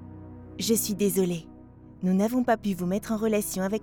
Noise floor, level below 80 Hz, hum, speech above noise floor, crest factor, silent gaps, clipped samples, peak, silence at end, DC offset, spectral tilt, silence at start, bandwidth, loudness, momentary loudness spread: -48 dBFS; -54 dBFS; none; 23 dB; 18 dB; none; under 0.1%; -10 dBFS; 0 s; under 0.1%; -5 dB/octave; 0 s; over 20 kHz; -27 LUFS; 11 LU